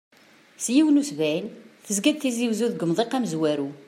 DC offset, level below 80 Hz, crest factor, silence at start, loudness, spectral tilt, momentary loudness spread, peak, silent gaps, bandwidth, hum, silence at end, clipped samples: under 0.1%; -76 dBFS; 18 dB; 0.6 s; -24 LUFS; -4.5 dB/octave; 8 LU; -6 dBFS; none; 16 kHz; none; 0.05 s; under 0.1%